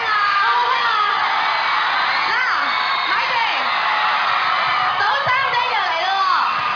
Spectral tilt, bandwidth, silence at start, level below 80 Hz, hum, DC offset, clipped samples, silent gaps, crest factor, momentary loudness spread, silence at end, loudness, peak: -1.5 dB/octave; 5.4 kHz; 0 s; -64 dBFS; none; under 0.1%; under 0.1%; none; 12 dB; 2 LU; 0 s; -17 LUFS; -6 dBFS